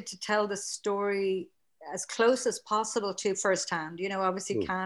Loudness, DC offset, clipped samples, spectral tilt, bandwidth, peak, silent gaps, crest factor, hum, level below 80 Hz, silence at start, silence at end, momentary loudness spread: -30 LUFS; under 0.1%; under 0.1%; -3 dB/octave; 12.5 kHz; -12 dBFS; none; 18 dB; none; -70 dBFS; 0 s; 0 s; 9 LU